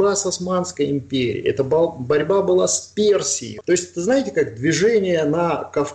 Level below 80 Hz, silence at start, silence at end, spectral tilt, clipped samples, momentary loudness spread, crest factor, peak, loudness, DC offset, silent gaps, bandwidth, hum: -56 dBFS; 0 s; 0 s; -4 dB/octave; under 0.1%; 5 LU; 12 dB; -8 dBFS; -19 LUFS; under 0.1%; none; 11.5 kHz; none